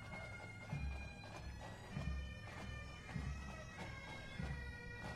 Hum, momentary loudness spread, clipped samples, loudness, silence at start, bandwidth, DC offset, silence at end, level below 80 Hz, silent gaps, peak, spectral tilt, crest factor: none; 5 LU; under 0.1%; -49 LUFS; 0 s; 13 kHz; under 0.1%; 0 s; -52 dBFS; none; -32 dBFS; -5.5 dB/octave; 16 dB